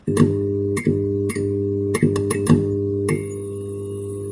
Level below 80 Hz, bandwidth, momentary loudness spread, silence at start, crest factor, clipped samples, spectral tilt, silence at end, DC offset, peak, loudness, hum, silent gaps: -50 dBFS; 11.5 kHz; 11 LU; 0.05 s; 18 dB; under 0.1%; -7 dB/octave; 0 s; under 0.1%; -2 dBFS; -21 LUFS; none; none